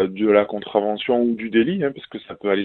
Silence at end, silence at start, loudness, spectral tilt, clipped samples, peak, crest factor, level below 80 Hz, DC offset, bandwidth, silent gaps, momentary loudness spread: 0 s; 0 s; -20 LUFS; -9.5 dB/octave; under 0.1%; -2 dBFS; 18 dB; -60 dBFS; under 0.1%; 4.2 kHz; none; 10 LU